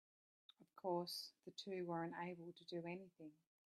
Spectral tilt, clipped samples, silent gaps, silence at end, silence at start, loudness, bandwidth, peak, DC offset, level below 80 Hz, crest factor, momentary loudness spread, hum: -5 dB/octave; under 0.1%; none; 0.4 s; 0.6 s; -49 LUFS; 14.5 kHz; -30 dBFS; under 0.1%; under -90 dBFS; 20 dB; 16 LU; none